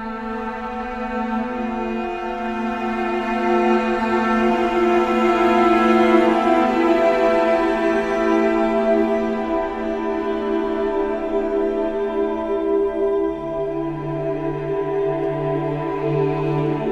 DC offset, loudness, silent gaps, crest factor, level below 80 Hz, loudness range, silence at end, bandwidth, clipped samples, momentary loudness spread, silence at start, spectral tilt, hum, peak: under 0.1%; -20 LUFS; none; 16 dB; -44 dBFS; 6 LU; 0 s; 8.6 kHz; under 0.1%; 9 LU; 0 s; -7 dB/octave; none; -4 dBFS